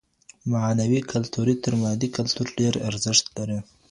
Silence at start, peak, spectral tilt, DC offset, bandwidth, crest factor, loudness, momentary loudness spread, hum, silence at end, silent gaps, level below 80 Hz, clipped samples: 0.45 s; -6 dBFS; -4.5 dB/octave; under 0.1%; 11.5 kHz; 20 dB; -24 LUFS; 10 LU; none; 0.3 s; none; -56 dBFS; under 0.1%